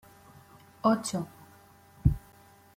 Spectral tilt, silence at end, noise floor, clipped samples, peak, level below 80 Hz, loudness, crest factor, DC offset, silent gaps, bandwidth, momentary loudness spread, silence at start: -6.5 dB/octave; 0.6 s; -57 dBFS; under 0.1%; -10 dBFS; -42 dBFS; -30 LUFS; 22 dB; under 0.1%; none; 16.5 kHz; 13 LU; 0.85 s